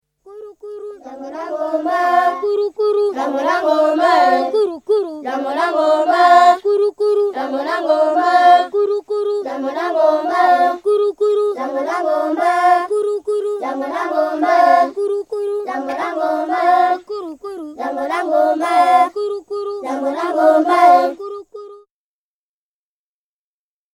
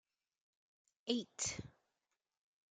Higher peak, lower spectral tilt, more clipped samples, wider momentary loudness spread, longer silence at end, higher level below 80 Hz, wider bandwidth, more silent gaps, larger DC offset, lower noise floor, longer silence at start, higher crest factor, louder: first, 0 dBFS vs -22 dBFS; about the same, -3 dB/octave vs -2.5 dB/octave; neither; about the same, 13 LU vs 12 LU; first, 2.2 s vs 1.05 s; first, -66 dBFS vs -74 dBFS; first, 12.5 kHz vs 9.6 kHz; neither; neither; about the same, under -90 dBFS vs under -90 dBFS; second, 0.25 s vs 1.05 s; second, 16 dB vs 26 dB; first, -16 LUFS vs -42 LUFS